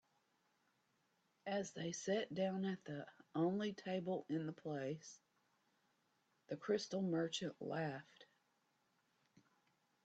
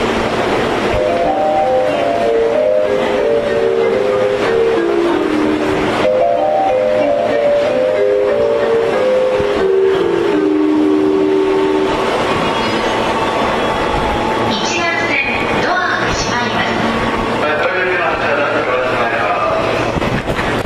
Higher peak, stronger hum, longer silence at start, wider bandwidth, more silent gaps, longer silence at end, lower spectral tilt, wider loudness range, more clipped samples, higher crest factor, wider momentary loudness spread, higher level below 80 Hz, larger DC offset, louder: second, -26 dBFS vs -4 dBFS; neither; first, 1.45 s vs 0 s; second, 8.8 kHz vs 13.5 kHz; neither; first, 1.8 s vs 0 s; about the same, -5.5 dB/octave vs -5 dB/octave; about the same, 3 LU vs 1 LU; neither; first, 20 dB vs 10 dB; first, 11 LU vs 2 LU; second, -86 dBFS vs -36 dBFS; neither; second, -44 LUFS vs -14 LUFS